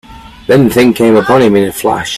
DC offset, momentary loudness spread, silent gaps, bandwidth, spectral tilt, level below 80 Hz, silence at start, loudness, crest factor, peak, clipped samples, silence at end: under 0.1%; 6 LU; none; 16 kHz; -5.5 dB/octave; -40 dBFS; 0.1 s; -9 LUFS; 10 dB; 0 dBFS; under 0.1%; 0 s